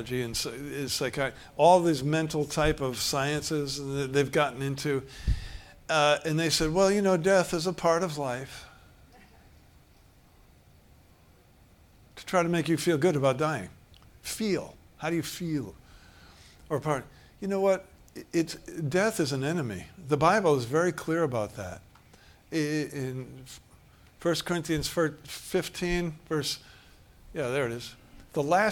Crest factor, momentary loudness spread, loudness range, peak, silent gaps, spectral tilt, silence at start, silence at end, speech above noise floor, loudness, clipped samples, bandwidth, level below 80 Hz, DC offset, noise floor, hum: 22 dB; 16 LU; 8 LU; -8 dBFS; none; -5 dB/octave; 0 s; 0 s; 31 dB; -28 LUFS; under 0.1%; 18 kHz; -48 dBFS; under 0.1%; -58 dBFS; none